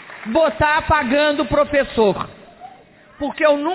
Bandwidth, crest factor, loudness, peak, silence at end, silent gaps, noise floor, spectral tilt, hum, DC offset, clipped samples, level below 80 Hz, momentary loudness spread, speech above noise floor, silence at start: 4 kHz; 14 dB; -18 LUFS; -4 dBFS; 0 s; none; -46 dBFS; -9.5 dB/octave; none; under 0.1%; under 0.1%; -38 dBFS; 12 LU; 29 dB; 0 s